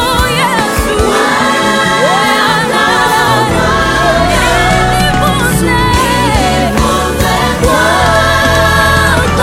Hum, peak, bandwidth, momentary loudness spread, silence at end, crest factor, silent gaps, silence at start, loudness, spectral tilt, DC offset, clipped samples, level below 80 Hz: none; 0 dBFS; 17 kHz; 3 LU; 0 s; 10 dB; none; 0 s; -9 LUFS; -4 dB/octave; under 0.1%; under 0.1%; -20 dBFS